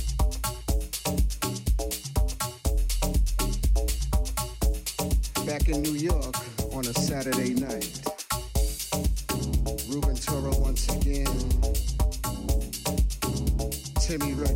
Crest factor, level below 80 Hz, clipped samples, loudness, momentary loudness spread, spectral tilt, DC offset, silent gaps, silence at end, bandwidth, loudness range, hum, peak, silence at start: 14 dB; -28 dBFS; under 0.1%; -28 LUFS; 4 LU; -4.5 dB/octave; under 0.1%; none; 0 s; 17 kHz; 1 LU; none; -12 dBFS; 0 s